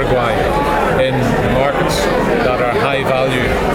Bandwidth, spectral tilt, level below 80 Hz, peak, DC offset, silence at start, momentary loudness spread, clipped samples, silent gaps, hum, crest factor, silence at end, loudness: 18 kHz; -5.5 dB/octave; -28 dBFS; -2 dBFS; under 0.1%; 0 s; 1 LU; under 0.1%; none; none; 12 dB; 0 s; -14 LUFS